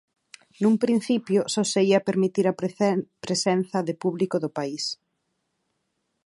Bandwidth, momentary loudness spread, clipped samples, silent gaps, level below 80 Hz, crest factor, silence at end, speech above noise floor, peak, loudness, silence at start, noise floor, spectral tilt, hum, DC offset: 11.5 kHz; 8 LU; under 0.1%; none; -72 dBFS; 18 dB; 1.3 s; 53 dB; -8 dBFS; -24 LUFS; 0.6 s; -76 dBFS; -5 dB/octave; none; under 0.1%